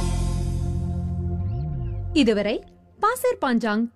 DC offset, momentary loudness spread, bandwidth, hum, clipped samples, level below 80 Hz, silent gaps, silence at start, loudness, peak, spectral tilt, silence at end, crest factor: under 0.1%; 8 LU; 15.5 kHz; none; under 0.1%; -32 dBFS; none; 0 s; -25 LUFS; -8 dBFS; -6.5 dB/octave; 0.05 s; 16 dB